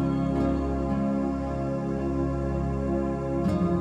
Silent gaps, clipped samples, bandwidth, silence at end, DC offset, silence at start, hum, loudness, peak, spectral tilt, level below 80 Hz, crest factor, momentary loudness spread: none; under 0.1%; 9.8 kHz; 0 s; under 0.1%; 0 s; none; -27 LUFS; -14 dBFS; -9 dB/octave; -36 dBFS; 12 dB; 3 LU